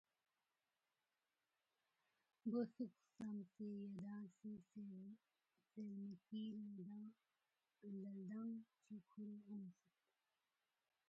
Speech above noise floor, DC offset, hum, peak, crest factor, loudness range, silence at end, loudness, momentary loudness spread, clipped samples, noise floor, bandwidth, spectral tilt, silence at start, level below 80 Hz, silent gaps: over 38 dB; under 0.1%; none; -34 dBFS; 20 dB; 4 LU; 1.35 s; -54 LUFS; 13 LU; under 0.1%; under -90 dBFS; 7.4 kHz; -8.5 dB/octave; 2.45 s; under -90 dBFS; none